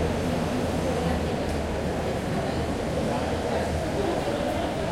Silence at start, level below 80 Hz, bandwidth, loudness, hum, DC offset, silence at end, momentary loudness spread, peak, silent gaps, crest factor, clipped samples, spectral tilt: 0 s; -38 dBFS; 16 kHz; -27 LUFS; none; under 0.1%; 0 s; 2 LU; -12 dBFS; none; 14 dB; under 0.1%; -6 dB/octave